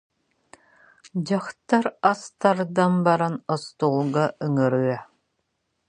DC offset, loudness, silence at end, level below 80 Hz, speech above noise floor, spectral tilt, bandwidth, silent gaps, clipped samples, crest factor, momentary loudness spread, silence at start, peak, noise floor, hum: under 0.1%; -23 LUFS; 0.85 s; -70 dBFS; 53 dB; -7 dB/octave; 10.5 kHz; none; under 0.1%; 22 dB; 8 LU; 1.15 s; -2 dBFS; -75 dBFS; none